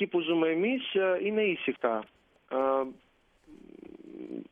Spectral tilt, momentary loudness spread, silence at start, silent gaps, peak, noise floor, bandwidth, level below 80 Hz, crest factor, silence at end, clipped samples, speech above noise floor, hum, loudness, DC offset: -7.5 dB/octave; 21 LU; 0 s; none; -12 dBFS; -59 dBFS; 3.8 kHz; -74 dBFS; 18 dB; 0.1 s; under 0.1%; 30 dB; none; -29 LUFS; under 0.1%